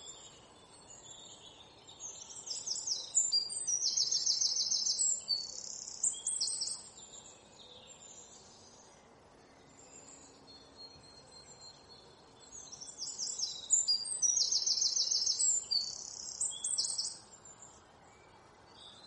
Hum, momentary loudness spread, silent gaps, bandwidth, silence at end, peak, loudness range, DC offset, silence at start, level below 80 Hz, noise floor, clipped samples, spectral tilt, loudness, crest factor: none; 25 LU; none; 11.5 kHz; 0 s; -18 dBFS; 19 LU; under 0.1%; 0 s; -74 dBFS; -60 dBFS; under 0.1%; 2 dB/octave; -31 LUFS; 20 dB